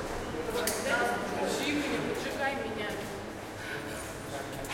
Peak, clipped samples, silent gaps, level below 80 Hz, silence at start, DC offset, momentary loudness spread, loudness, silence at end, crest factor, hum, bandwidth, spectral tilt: -16 dBFS; under 0.1%; none; -52 dBFS; 0 s; under 0.1%; 9 LU; -33 LUFS; 0 s; 18 dB; none; 16.5 kHz; -3.5 dB/octave